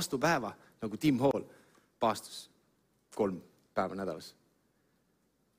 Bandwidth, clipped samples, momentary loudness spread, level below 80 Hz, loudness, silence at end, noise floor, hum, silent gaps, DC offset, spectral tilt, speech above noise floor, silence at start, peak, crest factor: 16 kHz; under 0.1%; 17 LU; -68 dBFS; -34 LUFS; 1.3 s; -74 dBFS; none; none; under 0.1%; -5 dB/octave; 41 dB; 0 s; -14 dBFS; 20 dB